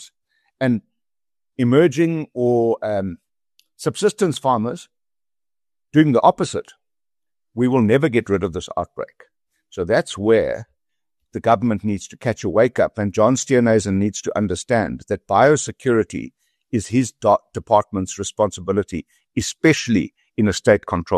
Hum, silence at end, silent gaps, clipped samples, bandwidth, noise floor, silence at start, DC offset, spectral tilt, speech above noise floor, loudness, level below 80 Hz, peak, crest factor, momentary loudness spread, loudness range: none; 0 s; none; under 0.1%; 13 kHz; under -90 dBFS; 0 s; under 0.1%; -5.5 dB/octave; over 72 dB; -19 LUFS; -50 dBFS; -2 dBFS; 18 dB; 12 LU; 3 LU